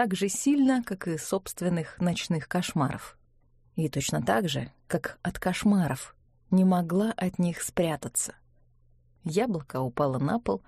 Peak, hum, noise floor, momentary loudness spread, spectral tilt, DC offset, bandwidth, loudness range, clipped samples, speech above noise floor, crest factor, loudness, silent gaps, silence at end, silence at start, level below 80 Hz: -10 dBFS; none; -62 dBFS; 9 LU; -5.5 dB/octave; under 0.1%; 14.5 kHz; 3 LU; under 0.1%; 35 dB; 18 dB; -28 LUFS; none; 0.1 s; 0 s; -56 dBFS